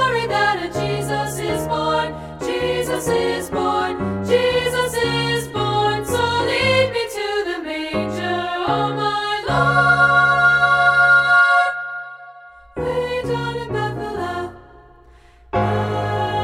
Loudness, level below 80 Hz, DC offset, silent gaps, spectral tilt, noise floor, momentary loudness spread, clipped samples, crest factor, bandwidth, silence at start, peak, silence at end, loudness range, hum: -18 LUFS; -44 dBFS; under 0.1%; none; -4.5 dB/octave; -47 dBFS; 12 LU; under 0.1%; 16 dB; 16.5 kHz; 0 s; -4 dBFS; 0 s; 10 LU; none